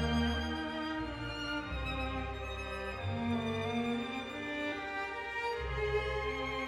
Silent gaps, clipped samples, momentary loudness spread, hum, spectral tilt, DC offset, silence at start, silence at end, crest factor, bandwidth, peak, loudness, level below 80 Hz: none; under 0.1%; 5 LU; none; -6 dB/octave; under 0.1%; 0 s; 0 s; 16 dB; 13.5 kHz; -20 dBFS; -37 LUFS; -46 dBFS